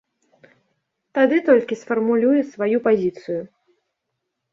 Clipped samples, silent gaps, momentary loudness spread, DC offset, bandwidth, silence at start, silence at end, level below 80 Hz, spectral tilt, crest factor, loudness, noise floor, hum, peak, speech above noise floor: under 0.1%; none; 12 LU; under 0.1%; 7.4 kHz; 1.15 s; 1.05 s; -66 dBFS; -7 dB/octave; 18 dB; -20 LUFS; -78 dBFS; none; -4 dBFS; 60 dB